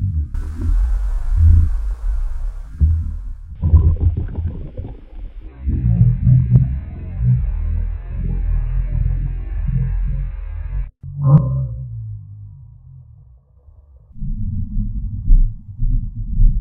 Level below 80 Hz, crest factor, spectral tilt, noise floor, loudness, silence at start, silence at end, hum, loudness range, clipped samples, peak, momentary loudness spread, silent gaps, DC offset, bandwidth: -20 dBFS; 16 dB; -11 dB/octave; -47 dBFS; -20 LUFS; 0 s; 0 s; none; 8 LU; under 0.1%; 0 dBFS; 18 LU; none; under 0.1%; 2.7 kHz